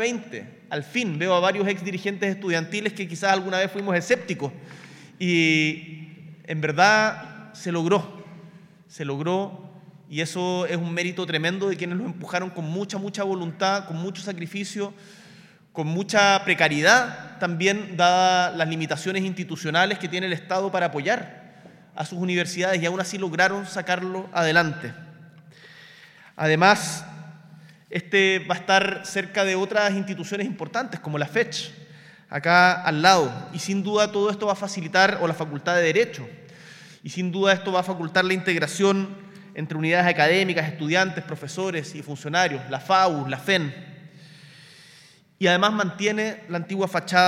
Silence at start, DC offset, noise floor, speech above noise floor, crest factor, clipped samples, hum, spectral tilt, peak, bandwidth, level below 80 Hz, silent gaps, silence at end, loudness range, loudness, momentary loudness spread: 0 s; under 0.1%; -53 dBFS; 30 dB; 22 dB; under 0.1%; none; -4.5 dB/octave; -2 dBFS; 15.5 kHz; -76 dBFS; none; 0 s; 6 LU; -23 LUFS; 15 LU